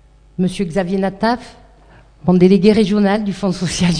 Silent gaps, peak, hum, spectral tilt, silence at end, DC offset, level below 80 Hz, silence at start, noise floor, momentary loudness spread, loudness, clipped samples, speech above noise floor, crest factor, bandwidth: none; 0 dBFS; none; -6.5 dB/octave; 0 s; under 0.1%; -40 dBFS; 0.4 s; -45 dBFS; 10 LU; -16 LUFS; under 0.1%; 31 dB; 16 dB; 10 kHz